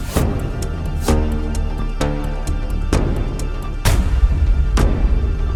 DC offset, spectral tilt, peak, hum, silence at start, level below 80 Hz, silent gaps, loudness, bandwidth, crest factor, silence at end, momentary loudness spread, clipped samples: under 0.1%; -6 dB/octave; 0 dBFS; none; 0 s; -18 dBFS; none; -20 LUFS; 17 kHz; 16 dB; 0 s; 7 LU; under 0.1%